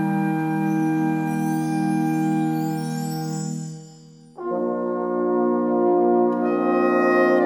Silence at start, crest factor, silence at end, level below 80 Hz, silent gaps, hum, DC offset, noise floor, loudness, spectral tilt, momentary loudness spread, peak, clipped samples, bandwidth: 0 s; 14 dB; 0 s; -74 dBFS; none; none; under 0.1%; -46 dBFS; -22 LUFS; -7.5 dB/octave; 9 LU; -8 dBFS; under 0.1%; 17.5 kHz